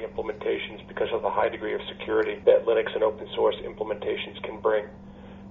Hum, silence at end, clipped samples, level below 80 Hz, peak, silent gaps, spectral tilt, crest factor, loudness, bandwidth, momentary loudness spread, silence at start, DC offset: none; 0 s; under 0.1%; -54 dBFS; -6 dBFS; none; -2.5 dB/octave; 20 dB; -27 LUFS; 4.2 kHz; 13 LU; 0 s; under 0.1%